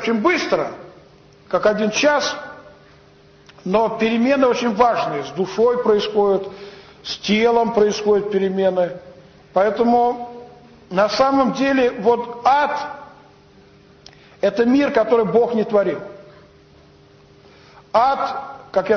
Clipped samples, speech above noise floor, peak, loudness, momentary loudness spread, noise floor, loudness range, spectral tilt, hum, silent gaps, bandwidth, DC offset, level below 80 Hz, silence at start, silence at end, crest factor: under 0.1%; 31 dB; -4 dBFS; -18 LUFS; 14 LU; -49 dBFS; 3 LU; -5 dB/octave; none; none; 6.8 kHz; under 0.1%; -54 dBFS; 0 s; 0 s; 16 dB